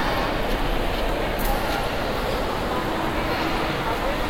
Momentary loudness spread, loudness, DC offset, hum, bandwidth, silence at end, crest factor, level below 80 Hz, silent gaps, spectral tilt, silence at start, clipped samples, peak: 1 LU; -25 LUFS; under 0.1%; none; 16.5 kHz; 0 s; 12 dB; -30 dBFS; none; -5 dB/octave; 0 s; under 0.1%; -10 dBFS